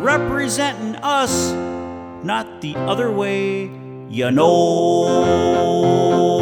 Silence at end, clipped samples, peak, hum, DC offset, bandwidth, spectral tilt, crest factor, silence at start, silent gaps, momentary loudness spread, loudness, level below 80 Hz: 0 s; under 0.1%; -2 dBFS; none; under 0.1%; 18.5 kHz; -5 dB/octave; 14 dB; 0 s; none; 13 LU; -18 LUFS; -48 dBFS